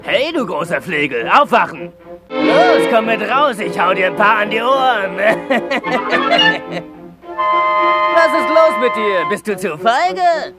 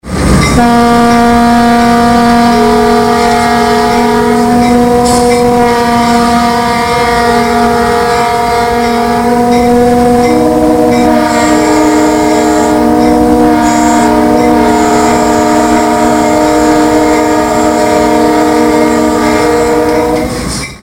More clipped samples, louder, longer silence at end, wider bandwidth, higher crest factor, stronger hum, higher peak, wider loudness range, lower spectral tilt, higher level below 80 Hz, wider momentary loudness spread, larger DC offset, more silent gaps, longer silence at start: second, under 0.1% vs 0.2%; second, -14 LUFS vs -8 LUFS; about the same, 0.05 s vs 0 s; second, 15 kHz vs 17 kHz; first, 14 dB vs 8 dB; neither; about the same, 0 dBFS vs 0 dBFS; about the same, 1 LU vs 2 LU; about the same, -4.5 dB/octave vs -5 dB/octave; second, -56 dBFS vs -26 dBFS; first, 8 LU vs 3 LU; second, under 0.1% vs 0.8%; neither; about the same, 0 s vs 0.05 s